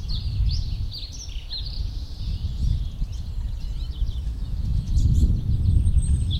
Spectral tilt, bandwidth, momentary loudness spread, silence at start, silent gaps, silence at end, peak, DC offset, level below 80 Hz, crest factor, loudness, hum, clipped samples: -6 dB/octave; 9.2 kHz; 11 LU; 0 s; none; 0 s; -8 dBFS; under 0.1%; -24 dBFS; 16 dB; -27 LUFS; none; under 0.1%